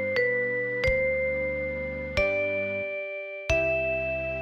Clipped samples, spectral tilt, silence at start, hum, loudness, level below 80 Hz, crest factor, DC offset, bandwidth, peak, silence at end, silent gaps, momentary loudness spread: under 0.1%; -5.5 dB/octave; 0 s; none; -27 LUFS; -42 dBFS; 16 dB; under 0.1%; 8.4 kHz; -12 dBFS; 0 s; none; 7 LU